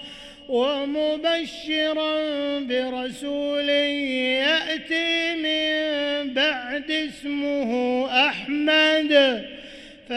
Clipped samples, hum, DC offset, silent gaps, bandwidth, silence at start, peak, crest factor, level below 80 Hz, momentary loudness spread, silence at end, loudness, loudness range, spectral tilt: under 0.1%; none; under 0.1%; none; 12 kHz; 0 s; -6 dBFS; 18 dB; -60 dBFS; 11 LU; 0 s; -22 LUFS; 3 LU; -3 dB/octave